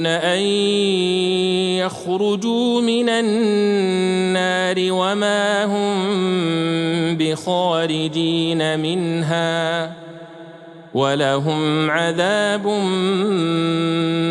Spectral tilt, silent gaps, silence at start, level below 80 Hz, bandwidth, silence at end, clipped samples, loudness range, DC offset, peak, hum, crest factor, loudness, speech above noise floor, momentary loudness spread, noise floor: -5 dB/octave; none; 0 s; -66 dBFS; 11.5 kHz; 0 s; under 0.1%; 3 LU; under 0.1%; -4 dBFS; none; 14 dB; -19 LUFS; 21 dB; 3 LU; -39 dBFS